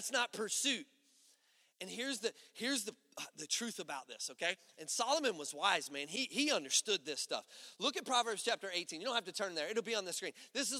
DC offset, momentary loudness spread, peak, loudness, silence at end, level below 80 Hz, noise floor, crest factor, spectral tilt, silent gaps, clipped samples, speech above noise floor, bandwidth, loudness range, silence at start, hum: under 0.1%; 11 LU; -16 dBFS; -37 LUFS; 0 s; under -90 dBFS; -72 dBFS; 22 dB; -0.5 dB/octave; none; under 0.1%; 33 dB; 16 kHz; 5 LU; 0 s; none